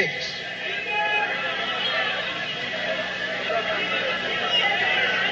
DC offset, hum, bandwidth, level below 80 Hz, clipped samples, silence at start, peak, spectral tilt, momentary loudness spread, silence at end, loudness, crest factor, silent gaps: under 0.1%; none; 8.2 kHz; -60 dBFS; under 0.1%; 0 s; -8 dBFS; -2.5 dB/octave; 7 LU; 0 s; -23 LUFS; 16 dB; none